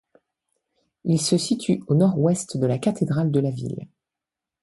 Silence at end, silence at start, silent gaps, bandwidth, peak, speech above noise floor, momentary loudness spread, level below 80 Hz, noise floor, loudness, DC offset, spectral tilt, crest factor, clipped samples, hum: 0.75 s; 1.05 s; none; 11.5 kHz; -8 dBFS; 66 dB; 12 LU; -62 dBFS; -87 dBFS; -22 LUFS; under 0.1%; -6.5 dB/octave; 16 dB; under 0.1%; none